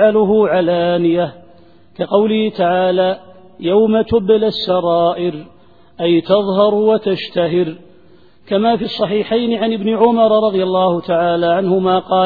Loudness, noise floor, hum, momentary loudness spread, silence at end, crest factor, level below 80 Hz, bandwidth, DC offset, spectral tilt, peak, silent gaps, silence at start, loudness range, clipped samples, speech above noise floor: -15 LUFS; -48 dBFS; none; 6 LU; 0 s; 14 dB; -52 dBFS; 4.9 kHz; 0.4%; -9 dB/octave; 0 dBFS; none; 0 s; 2 LU; under 0.1%; 34 dB